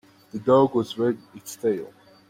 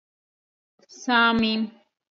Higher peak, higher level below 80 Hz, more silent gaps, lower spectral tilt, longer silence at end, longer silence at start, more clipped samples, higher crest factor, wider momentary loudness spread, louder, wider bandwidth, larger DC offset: first, -6 dBFS vs -10 dBFS; about the same, -64 dBFS vs -60 dBFS; neither; first, -6.5 dB/octave vs -4 dB/octave; about the same, 0.4 s vs 0.45 s; second, 0.35 s vs 1 s; neither; about the same, 18 dB vs 16 dB; first, 19 LU vs 15 LU; second, -24 LUFS vs -21 LUFS; first, 16.5 kHz vs 7.4 kHz; neither